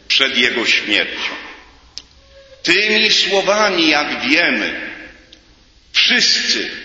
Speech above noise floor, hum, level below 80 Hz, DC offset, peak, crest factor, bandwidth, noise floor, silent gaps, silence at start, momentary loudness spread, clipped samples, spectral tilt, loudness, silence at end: 33 dB; none; -52 dBFS; under 0.1%; 0 dBFS; 18 dB; 8 kHz; -49 dBFS; none; 0.1 s; 12 LU; under 0.1%; -1.5 dB/octave; -13 LUFS; 0 s